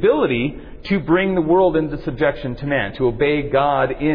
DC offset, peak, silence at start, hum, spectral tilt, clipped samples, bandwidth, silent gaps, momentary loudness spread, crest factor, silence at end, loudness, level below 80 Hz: under 0.1%; -4 dBFS; 0 s; none; -9.5 dB/octave; under 0.1%; 5.2 kHz; none; 8 LU; 14 dB; 0 s; -19 LUFS; -38 dBFS